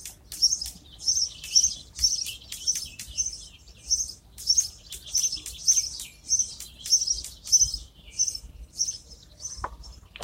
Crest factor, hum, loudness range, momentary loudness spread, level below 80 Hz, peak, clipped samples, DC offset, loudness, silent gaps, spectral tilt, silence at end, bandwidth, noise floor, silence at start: 24 dB; none; 3 LU; 17 LU; -48 dBFS; -6 dBFS; under 0.1%; under 0.1%; -24 LUFS; none; 1.5 dB/octave; 0 s; 16.5 kHz; -47 dBFS; 0 s